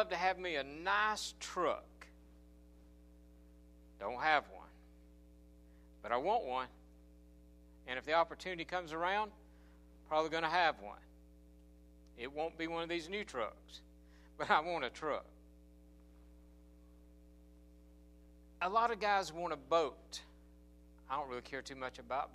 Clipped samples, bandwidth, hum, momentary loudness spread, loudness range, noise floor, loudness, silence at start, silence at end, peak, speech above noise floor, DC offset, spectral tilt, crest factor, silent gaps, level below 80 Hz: under 0.1%; 15 kHz; none; 16 LU; 5 LU; -61 dBFS; -38 LUFS; 0 s; 0 s; -16 dBFS; 23 dB; under 0.1%; -3.5 dB/octave; 24 dB; none; -62 dBFS